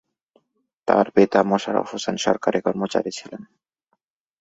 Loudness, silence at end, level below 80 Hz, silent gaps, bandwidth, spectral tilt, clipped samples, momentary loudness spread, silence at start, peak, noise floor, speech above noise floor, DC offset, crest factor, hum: -21 LUFS; 0.95 s; -62 dBFS; none; 8 kHz; -5 dB/octave; under 0.1%; 15 LU; 0.85 s; 0 dBFS; -73 dBFS; 52 dB; under 0.1%; 22 dB; none